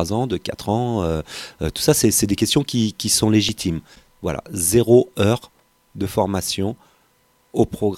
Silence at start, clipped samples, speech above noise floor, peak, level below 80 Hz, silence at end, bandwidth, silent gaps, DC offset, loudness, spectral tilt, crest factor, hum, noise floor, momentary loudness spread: 0 s; under 0.1%; 41 dB; 0 dBFS; -42 dBFS; 0 s; 16.5 kHz; none; under 0.1%; -20 LUFS; -4.5 dB/octave; 20 dB; none; -60 dBFS; 12 LU